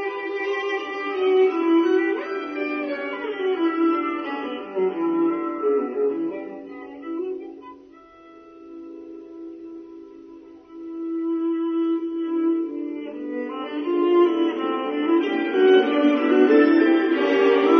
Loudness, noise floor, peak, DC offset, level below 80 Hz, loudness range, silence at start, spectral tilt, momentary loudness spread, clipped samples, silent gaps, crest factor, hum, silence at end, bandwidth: -22 LUFS; -47 dBFS; -4 dBFS; under 0.1%; -72 dBFS; 18 LU; 0 s; -5.5 dB/octave; 22 LU; under 0.1%; none; 18 dB; none; 0 s; 6.4 kHz